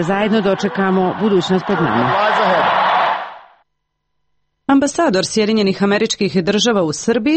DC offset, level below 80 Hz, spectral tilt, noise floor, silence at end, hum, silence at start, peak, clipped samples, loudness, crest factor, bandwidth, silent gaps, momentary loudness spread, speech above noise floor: under 0.1%; -52 dBFS; -4.5 dB/octave; -73 dBFS; 0 s; none; 0 s; -4 dBFS; under 0.1%; -15 LUFS; 12 dB; 8.8 kHz; none; 3 LU; 58 dB